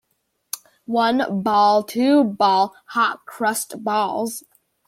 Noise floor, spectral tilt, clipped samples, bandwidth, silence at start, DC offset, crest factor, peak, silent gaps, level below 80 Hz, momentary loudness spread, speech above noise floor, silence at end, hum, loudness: -71 dBFS; -4 dB/octave; under 0.1%; 16.5 kHz; 0.55 s; under 0.1%; 16 dB; -6 dBFS; none; -68 dBFS; 15 LU; 52 dB; 0.45 s; none; -20 LUFS